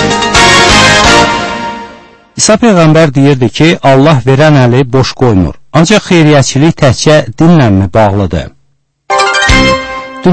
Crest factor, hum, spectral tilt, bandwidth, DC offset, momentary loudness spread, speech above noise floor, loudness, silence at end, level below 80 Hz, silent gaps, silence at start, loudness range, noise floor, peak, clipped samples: 6 dB; none; -4.5 dB/octave; 11 kHz; under 0.1%; 10 LU; 49 dB; -6 LUFS; 0 s; -24 dBFS; none; 0 s; 2 LU; -54 dBFS; 0 dBFS; 4%